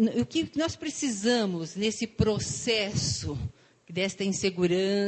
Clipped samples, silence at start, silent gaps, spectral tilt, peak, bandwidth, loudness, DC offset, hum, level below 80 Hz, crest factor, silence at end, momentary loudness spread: under 0.1%; 0 s; none; -4.5 dB/octave; -10 dBFS; 9.2 kHz; -28 LUFS; under 0.1%; none; -48 dBFS; 18 dB; 0 s; 6 LU